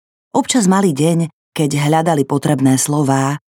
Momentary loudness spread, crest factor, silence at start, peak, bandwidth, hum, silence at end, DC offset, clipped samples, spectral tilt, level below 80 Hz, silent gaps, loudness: 6 LU; 14 dB; 0.35 s; 0 dBFS; 18 kHz; none; 0.1 s; under 0.1%; under 0.1%; -5.5 dB/octave; -62 dBFS; 1.33-1.52 s; -15 LUFS